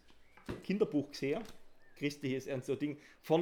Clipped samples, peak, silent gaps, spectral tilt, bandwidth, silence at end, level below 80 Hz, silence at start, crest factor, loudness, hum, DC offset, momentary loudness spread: under 0.1%; -16 dBFS; none; -6.5 dB/octave; 18.5 kHz; 0 s; -64 dBFS; 0.05 s; 20 dB; -38 LUFS; none; under 0.1%; 14 LU